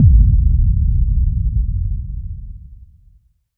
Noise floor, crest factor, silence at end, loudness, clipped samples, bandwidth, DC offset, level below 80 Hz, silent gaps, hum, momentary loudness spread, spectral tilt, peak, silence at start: -52 dBFS; 14 dB; 0.8 s; -17 LUFS; under 0.1%; 0.3 kHz; under 0.1%; -16 dBFS; none; none; 19 LU; -15.5 dB/octave; 0 dBFS; 0 s